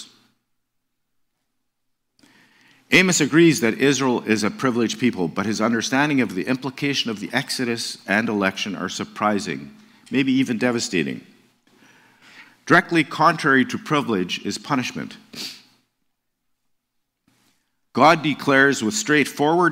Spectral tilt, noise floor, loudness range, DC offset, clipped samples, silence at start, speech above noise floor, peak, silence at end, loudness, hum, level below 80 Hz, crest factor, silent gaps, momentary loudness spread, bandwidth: -4 dB/octave; -75 dBFS; 6 LU; under 0.1%; under 0.1%; 0 s; 55 dB; -2 dBFS; 0 s; -20 LUFS; none; -66 dBFS; 20 dB; none; 12 LU; 16 kHz